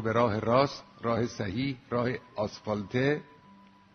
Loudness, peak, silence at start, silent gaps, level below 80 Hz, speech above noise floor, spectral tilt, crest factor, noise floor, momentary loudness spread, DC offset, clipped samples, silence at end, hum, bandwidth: -30 LUFS; -10 dBFS; 0 s; none; -60 dBFS; 27 dB; -6.5 dB/octave; 20 dB; -56 dBFS; 9 LU; under 0.1%; under 0.1%; 0.7 s; none; 6.6 kHz